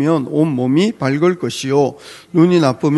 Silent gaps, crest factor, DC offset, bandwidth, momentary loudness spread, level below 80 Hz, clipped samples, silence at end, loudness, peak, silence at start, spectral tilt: none; 14 dB; under 0.1%; 12 kHz; 8 LU; -58 dBFS; under 0.1%; 0 s; -15 LUFS; 0 dBFS; 0 s; -6.5 dB/octave